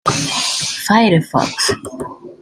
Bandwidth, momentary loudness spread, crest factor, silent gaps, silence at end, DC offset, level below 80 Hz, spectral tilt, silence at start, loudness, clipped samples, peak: 16 kHz; 17 LU; 16 dB; none; 0.1 s; under 0.1%; -50 dBFS; -3.5 dB/octave; 0.05 s; -15 LUFS; under 0.1%; -2 dBFS